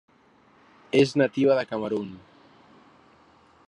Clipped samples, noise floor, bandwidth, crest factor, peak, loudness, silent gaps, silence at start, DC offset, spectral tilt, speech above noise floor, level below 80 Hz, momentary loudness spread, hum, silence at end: under 0.1%; -59 dBFS; 10.5 kHz; 20 dB; -8 dBFS; -24 LUFS; none; 0.95 s; under 0.1%; -6 dB/octave; 36 dB; -72 dBFS; 10 LU; none; 1.5 s